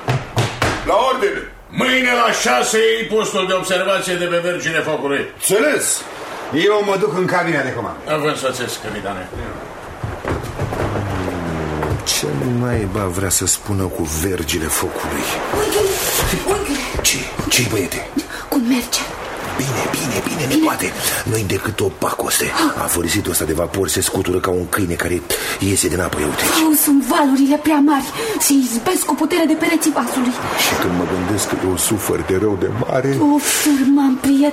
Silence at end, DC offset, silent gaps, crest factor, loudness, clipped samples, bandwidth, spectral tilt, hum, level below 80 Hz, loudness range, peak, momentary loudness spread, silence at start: 0 s; under 0.1%; none; 16 dB; -17 LUFS; under 0.1%; 16 kHz; -3.5 dB/octave; none; -38 dBFS; 5 LU; -2 dBFS; 9 LU; 0 s